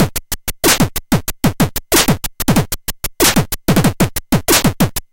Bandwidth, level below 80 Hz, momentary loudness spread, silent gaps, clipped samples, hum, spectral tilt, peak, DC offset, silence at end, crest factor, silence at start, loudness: 17.5 kHz; -28 dBFS; 7 LU; none; under 0.1%; none; -4 dB/octave; 0 dBFS; under 0.1%; 0.15 s; 14 dB; 0 s; -15 LUFS